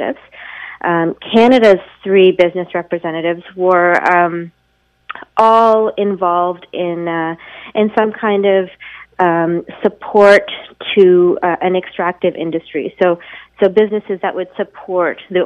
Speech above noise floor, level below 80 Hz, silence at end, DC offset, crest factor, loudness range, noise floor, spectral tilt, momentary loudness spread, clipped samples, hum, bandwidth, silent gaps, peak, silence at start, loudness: 46 dB; -56 dBFS; 0 s; under 0.1%; 14 dB; 4 LU; -59 dBFS; -6.5 dB/octave; 15 LU; under 0.1%; none; 9.4 kHz; none; 0 dBFS; 0 s; -14 LUFS